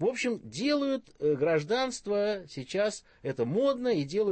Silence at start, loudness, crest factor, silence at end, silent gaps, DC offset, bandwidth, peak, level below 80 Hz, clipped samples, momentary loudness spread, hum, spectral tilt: 0 s; -30 LUFS; 14 dB; 0 s; none; under 0.1%; 8.8 kHz; -16 dBFS; -66 dBFS; under 0.1%; 6 LU; none; -5 dB/octave